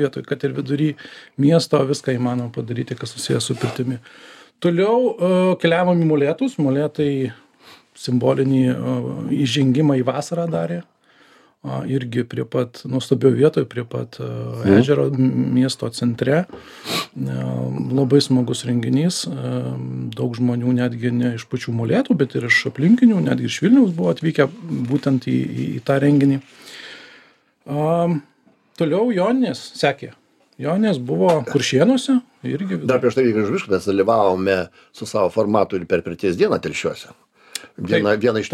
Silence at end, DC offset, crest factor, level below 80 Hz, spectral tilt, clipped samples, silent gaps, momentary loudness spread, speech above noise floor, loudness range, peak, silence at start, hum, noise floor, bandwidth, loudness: 0 s; under 0.1%; 18 dB; -60 dBFS; -6.5 dB/octave; under 0.1%; none; 12 LU; 34 dB; 4 LU; -2 dBFS; 0 s; none; -53 dBFS; 14 kHz; -19 LUFS